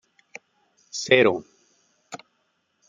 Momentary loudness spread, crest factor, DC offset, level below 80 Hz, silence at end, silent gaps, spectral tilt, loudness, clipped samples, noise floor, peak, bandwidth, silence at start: 27 LU; 24 dB; under 0.1%; -74 dBFS; 0.7 s; none; -3.5 dB/octave; -21 LUFS; under 0.1%; -71 dBFS; -2 dBFS; 9.4 kHz; 0.95 s